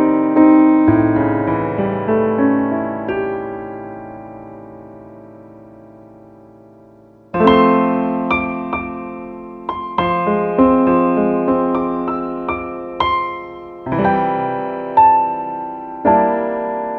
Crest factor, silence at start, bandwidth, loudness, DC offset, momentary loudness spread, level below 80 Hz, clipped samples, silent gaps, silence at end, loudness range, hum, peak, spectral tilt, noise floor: 16 dB; 0 s; 4.5 kHz; -16 LUFS; under 0.1%; 19 LU; -46 dBFS; under 0.1%; none; 0 s; 11 LU; none; 0 dBFS; -9.5 dB/octave; -45 dBFS